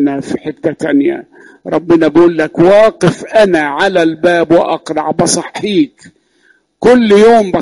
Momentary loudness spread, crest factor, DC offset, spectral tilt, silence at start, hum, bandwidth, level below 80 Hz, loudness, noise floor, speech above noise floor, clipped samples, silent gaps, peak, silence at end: 11 LU; 10 dB; under 0.1%; -5 dB/octave; 0 s; none; 11.5 kHz; -46 dBFS; -10 LUFS; -52 dBFS; 42 dB; under 0.1%; none; 0 dBFS; 0 s